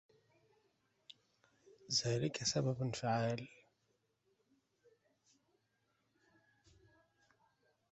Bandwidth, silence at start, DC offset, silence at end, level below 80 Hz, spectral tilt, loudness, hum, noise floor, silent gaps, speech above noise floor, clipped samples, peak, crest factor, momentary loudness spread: 8 kHz; 1.9 s; under 0.1%; 4.45 s; -74 dBFS; -4.5 dB/octave; -38 LUFS; none; -81 dBFS; none; 44 dB; under 0.1%; -22 dBFS; 22 dB; 6 LU